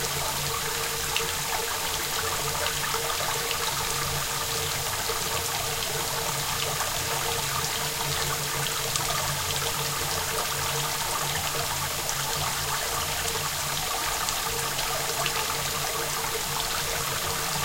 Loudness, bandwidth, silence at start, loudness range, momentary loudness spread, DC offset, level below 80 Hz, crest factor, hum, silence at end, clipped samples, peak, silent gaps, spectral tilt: -26 LUFS; 16 kHz; 0 s; 0 LU; 1 LU; under 0.1%; -46 dBFS; 22 dB; none; 0 s; under 0.1%; -6 dBFS; none; -1.5 dB/octave